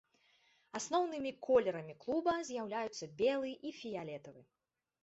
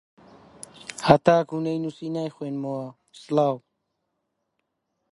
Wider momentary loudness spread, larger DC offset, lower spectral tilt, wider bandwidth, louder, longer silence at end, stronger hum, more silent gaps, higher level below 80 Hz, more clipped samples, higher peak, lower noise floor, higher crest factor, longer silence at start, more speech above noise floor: second, 13 LU vs 21 LU; neither; second, -3.5 dB/octave vs -6.5 dB/octave; second, 8 kHz vs 11.5 kHz; second, -37 LUFS vs -24 LUFS; second, 0.6 s vs 1.55 s; neither; neither; second, -76 dBFS vs -58 dBFS; neither; second, -18 dBFS vs 0 dBFS; second, -72 dBFS vs -78 dBFS; second, 20 dB vs 26 dB; about the same, 0.75 s vs 0.85 s; second, 35 dB vs 55 dB